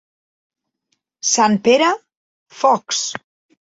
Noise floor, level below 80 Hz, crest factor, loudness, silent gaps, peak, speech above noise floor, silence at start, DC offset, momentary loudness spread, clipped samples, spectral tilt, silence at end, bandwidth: -71 dBFS; -66 dBFS; 18 dB; -17 LUFS; 2.17-2.46 s; -2 dBFS; 56 dB; 1.25 s; under 0.1%; 12 LU; under 0.1%; -2.5 dB/octave; 0.45 s; 8 kHz